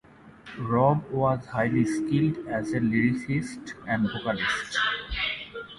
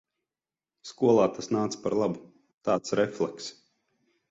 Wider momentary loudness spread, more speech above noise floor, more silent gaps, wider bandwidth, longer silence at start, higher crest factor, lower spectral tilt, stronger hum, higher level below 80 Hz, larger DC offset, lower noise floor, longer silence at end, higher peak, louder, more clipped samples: second, 7 LU vs 18 LU; second, 23 dB vs over 63 dB; second, none vs 2.54-2.58 s; first, 11.5 kHz vs 8 kHz; second, 0.25 s vs 0.85 s; about the same, 18 dB vs 20 dB; about the same, -6 dB/octave vs -5.5 dB/octave; neither; first, -50 dBFS vs -68 dBFS; neither; second, -48 dBFS vs under -90 dBFS; second, 0 s vs 0.8 s; about the same, -8 dBFS vs -10 dBFS; about the same, -26 LUFS vs -27 LUFS; neither